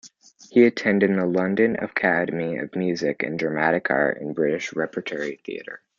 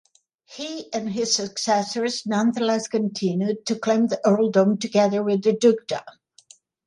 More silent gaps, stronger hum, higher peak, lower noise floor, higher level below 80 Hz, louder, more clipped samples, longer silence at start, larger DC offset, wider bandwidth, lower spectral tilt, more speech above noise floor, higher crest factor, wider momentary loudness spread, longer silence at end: neither; neither; about the same, -4 dBFS vs -4 dBFS; second, -50 dBFS vs -54 dBFS; about the same, -66 dBFS vs -70 dBFS; about the same, -23 LUFS vs -22 LUFS; neither; second, 0.05 s vs 0.5 s; neither; second, 7.4 kHz vs 11.5 kHz; first, -6.5 dB/octave vs -4.5 dB/octave; second, 27 dB vs 32 dB; about the same, 20 dB vs 18 dB; about the same, 11 LU vs 10 LU; second, 0.2 s vs 0.75 s